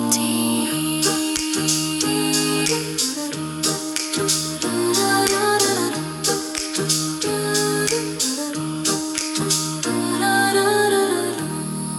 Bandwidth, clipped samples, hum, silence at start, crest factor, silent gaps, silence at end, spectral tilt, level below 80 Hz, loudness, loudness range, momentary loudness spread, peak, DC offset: 17.5 kHz; under 0.1%; none; 0 s; 20 dB; none; 0 s; -2.5 dB/octave; -56 dBFS; -20 LUFS; 2 LU; 6 LU; -2 dBFS; under 0.1%